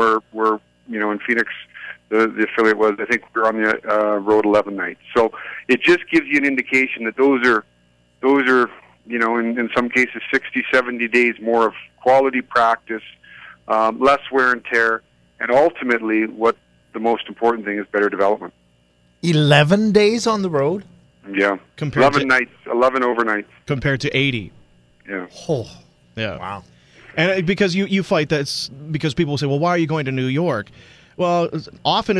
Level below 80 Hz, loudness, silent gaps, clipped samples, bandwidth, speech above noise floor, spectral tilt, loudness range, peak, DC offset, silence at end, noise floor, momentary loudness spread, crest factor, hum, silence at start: -54 dBFS; -18 LUFS; none; under 0.1%; 11 kHz; 40 dB; -5.5 dB/octave; 4 LU; 0 dBFS; under 0.1%; 0 s; -58 dBFS; 11 LU; 18 dB; 60 Hz at -55 dBFS; 0 s